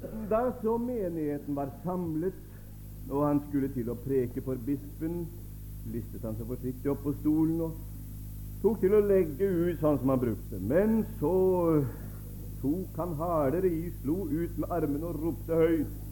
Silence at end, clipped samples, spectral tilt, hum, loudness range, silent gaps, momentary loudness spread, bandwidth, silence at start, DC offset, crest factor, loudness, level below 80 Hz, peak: 0 s; under 0.1%; -9 dB/octave; none; 6 LU; none; 16 LU; 17.5 kHz; 0 s; under 0.1%; 16 dB; -30 LUFS; -44 dBFS; -14 dBFS